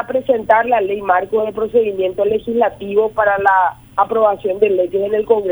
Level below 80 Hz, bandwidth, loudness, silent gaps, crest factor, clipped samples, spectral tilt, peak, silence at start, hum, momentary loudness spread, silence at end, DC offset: -50 dBFS; over 20 kHz; -16 LUFS; none; 14 dB; under 0.1%; -6.5 dB/octave; 0 dBFS; 0 s; none; 5 LU; 0 s; under 0.1%